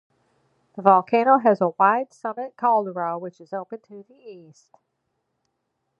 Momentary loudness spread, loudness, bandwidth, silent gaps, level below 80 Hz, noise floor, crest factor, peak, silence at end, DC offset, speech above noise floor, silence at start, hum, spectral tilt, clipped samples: 17 LU; -20 LUFS; 7.4 kHz; none; -80 dBFS; -76 dBFS; 22 dB; -2 dBFS; 1.6 s; under 0.1%; 54 dB; 0.75 s; none; -7.5 dB/octave; under 0.1%